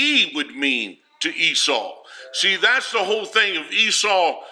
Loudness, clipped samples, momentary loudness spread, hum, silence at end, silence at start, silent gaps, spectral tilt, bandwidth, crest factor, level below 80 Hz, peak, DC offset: -18 LUFS; under 0.1%; 9 LU; none; 0 s; 0 s; none; 0 dB/octave; 16 kHz; 16 dB; -84 dBFS; -4 dBFS; under 0.1%